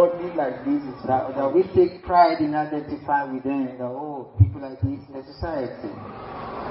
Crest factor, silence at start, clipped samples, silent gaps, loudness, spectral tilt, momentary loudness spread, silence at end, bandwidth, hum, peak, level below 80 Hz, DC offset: 20 dB; 0 s; under 0.1%; none; -24 LUFS; -12.5 dB/octave; 16 LU; 0 s; 5.8 kHz; none; -4 dBFS; -44 dBFS; under 0.1%